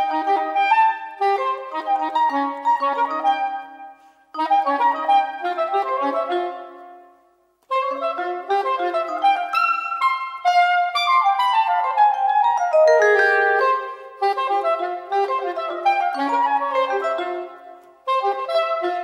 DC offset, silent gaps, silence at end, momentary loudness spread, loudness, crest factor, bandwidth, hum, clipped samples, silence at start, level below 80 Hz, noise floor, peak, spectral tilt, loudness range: under 0.1%; none; 0 s; 9 LU; -20 LUFS; 16 dB; 13.5 kHz; none; under 0.1%; 0 s; -76 dBFS; -60 dBFS; -4 dBFS; -1.5 dB/octave; 6 LU